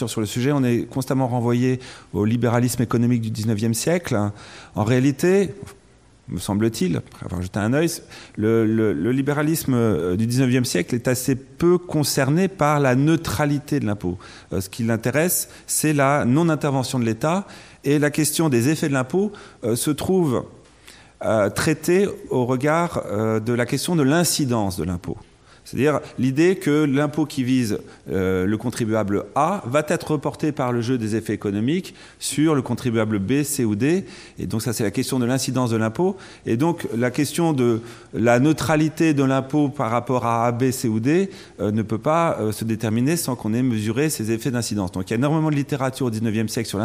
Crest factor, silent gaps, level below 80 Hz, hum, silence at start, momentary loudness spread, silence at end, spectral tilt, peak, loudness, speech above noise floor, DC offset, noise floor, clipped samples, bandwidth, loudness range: 16 dB; none; -54 dBFS; none; 0 s; 8 LU; 0 s; -5.5 dB/octave; -4 dBFS; -21 LUFS; 27 dB; under 0.1%; -48 dBFS; under 0.1%; 16 kHz; 3 LU